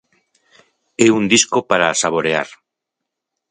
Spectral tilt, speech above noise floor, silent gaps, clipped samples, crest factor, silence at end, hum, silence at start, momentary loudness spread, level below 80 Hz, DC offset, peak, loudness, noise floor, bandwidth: -3 dB/octave; 65 dB; none; under 0.1%; 18 dB; 1.05 s; none; 1 s; 11 LU; -58 dBFS; under 0.1%; 0 dBFS; -15 LUFS; -81 dBFS; 11 kHz